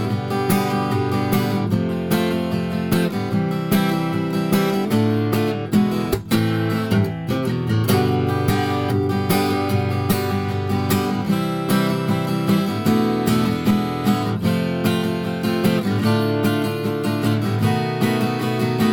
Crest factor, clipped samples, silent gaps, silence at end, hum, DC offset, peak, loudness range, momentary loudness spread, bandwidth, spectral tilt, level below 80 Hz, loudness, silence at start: 14 dB; under 0.1%; none; 0 s; none; under 0.1%; -6 dBFS; 1 LU; 3 LU; over 20 kHz; -6.5 dB/octave; -48 dBFS; -20 LUFS; 0 s